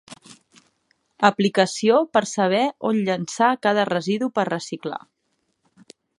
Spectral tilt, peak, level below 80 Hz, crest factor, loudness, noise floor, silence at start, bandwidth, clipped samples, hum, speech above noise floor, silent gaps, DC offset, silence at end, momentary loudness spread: -4.5 dB/octave; -2 dBFS; -72 dBFS; 22 dB; -21 LUFS; -72 dBFS; 0.1 s; 11.5 kHz; under 0.1%; none; 51 dB; none; under 0.1%; 1.2 s; 10 LU